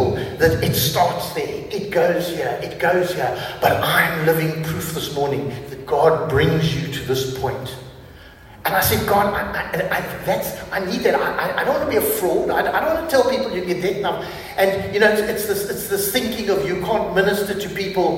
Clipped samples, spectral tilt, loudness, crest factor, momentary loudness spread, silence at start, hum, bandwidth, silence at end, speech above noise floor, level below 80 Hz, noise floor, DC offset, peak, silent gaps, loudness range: under 0.1%; -4.5 dB/octave; -20 LUFS; 20 dB; 8 LU; 0 s; none; 16.5 kHz; 0 s; 22 dB; -44 dBFS; -42 dBFS; under 0.1%; 0 dBFS; none; 2 LU